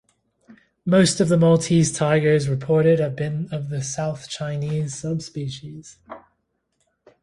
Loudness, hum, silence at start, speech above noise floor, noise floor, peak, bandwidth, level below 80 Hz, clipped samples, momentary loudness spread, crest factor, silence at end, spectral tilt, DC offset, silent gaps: -21 LUFS; none; 0.85 s; 52 dB; -72 dBFS; -4 dBFS; 11.5 kHz; -56 dBFS; under 0.1%; 15 LU; 18 dB; 1.05 s; -6 dB/octave; under 0.1%; none